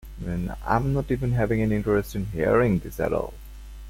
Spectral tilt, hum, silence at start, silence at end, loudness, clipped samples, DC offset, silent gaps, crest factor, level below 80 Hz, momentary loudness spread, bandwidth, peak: -8 dB/octave; none; 0.05 s; 0 s; -25 LUFS; under 0.1%; under 0.1%; none; 18 dB; -38 dBFS; 10 LU; 16.5 kHz; -6 dBFS